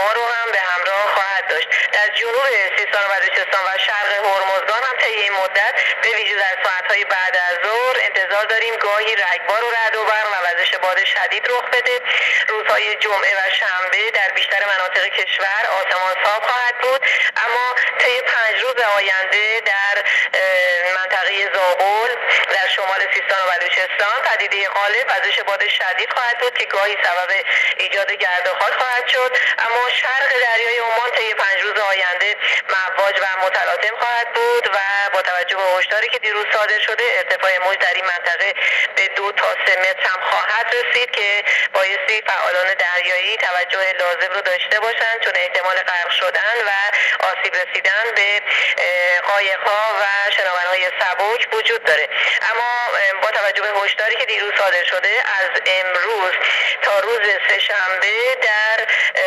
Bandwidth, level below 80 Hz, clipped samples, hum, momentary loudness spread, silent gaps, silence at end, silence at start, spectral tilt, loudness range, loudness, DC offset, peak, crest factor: 13.5 kHz; -76 dBFS; under 0.1%; none; 3 LU; none; 0 s; 0 s; 1.5 dB/octave; 1 LU; -16 LUFS; under 0.1%; -4 dBFS; 14 dB